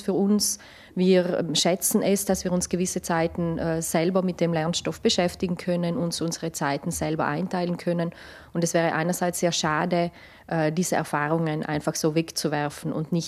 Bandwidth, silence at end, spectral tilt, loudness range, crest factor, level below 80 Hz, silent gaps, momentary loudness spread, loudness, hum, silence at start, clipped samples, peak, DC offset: 15.5 kHz; 0 s; -4.5 dB/octave; 3 LU; 16 dB; -56 dBFS; none; 6 LU; -25 LUFS; none; 0 s; under 0.1%; -8 dBFS; under 0.1%